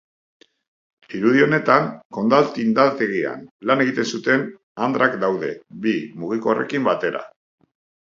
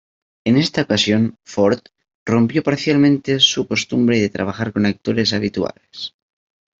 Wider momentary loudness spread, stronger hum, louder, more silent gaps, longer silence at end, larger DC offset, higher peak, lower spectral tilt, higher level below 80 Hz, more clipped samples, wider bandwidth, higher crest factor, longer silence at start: about the same, 11 LU vs 12 LU; neither; second, -20 LUFS vs -17 LUFS; first, 2.05-2.10 s, 3.51-3.59 s, 4.63-4.75 s vs 2.15-2.26 s; about the same, 0.8 s vs 0.7 s; neither; about the same, 0 dBFS vs -2 dBFS; about the same, -6 dB/octave vs -5 dB/octave; second, -68 dBFS vs -56 dBFS; neither; about the same, 7.6 kHz vs 7.8 kHz; about the same, 20 dB vs 16 dB; first, 1.1 s vs 0.45 s